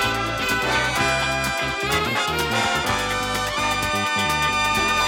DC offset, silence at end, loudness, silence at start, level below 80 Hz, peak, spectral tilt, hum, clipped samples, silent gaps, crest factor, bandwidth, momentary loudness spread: under 0.1%; 0 s; -21 LUFS; 0 s; -40 dBFS; -8 dBFS; -2.5 dB/octave; none; under 0.1%; none; 14 dB; 18.5 kHz; 3 LU